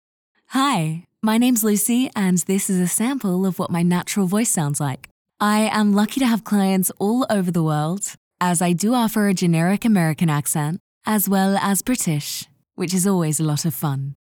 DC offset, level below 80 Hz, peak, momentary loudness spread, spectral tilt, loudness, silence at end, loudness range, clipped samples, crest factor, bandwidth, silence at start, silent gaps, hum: under 0.1%; -60 dBFS; -6 dBFS; 7 LU; -5 dB/octave; -20 LUFS; 0.25 s; 1 LU; under 0.1%; 12 dB; over 20 kHz; 0.5 s; 5.11-5.25 s, 8.17-8.31 s, 10.80-11.01 s; none